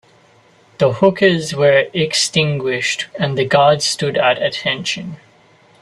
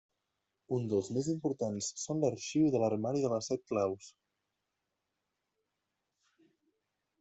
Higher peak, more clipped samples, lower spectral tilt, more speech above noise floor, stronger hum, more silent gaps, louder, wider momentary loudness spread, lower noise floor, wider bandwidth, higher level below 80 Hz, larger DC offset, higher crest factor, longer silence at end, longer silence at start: first, 0 dBFS vs -18 dBFS; neither; second, -4 dB/octave vs -6 dB/octave; second, 35 dB vs 53 dB; neither; neither; first, -15 LUFS vs -34 LUFS; about the same, 7 LU vs 7 LU; second, -50 dBFS vs -86 dBFS; first, 13 kHz vs 8.2 kHz; first, -56 dBFS vs -74 dBFS; neither; about the same, 16 dB vs 18 dB; second, 0.65 s vs 3.1 s; about the same, 0.8 s vs 0.7 s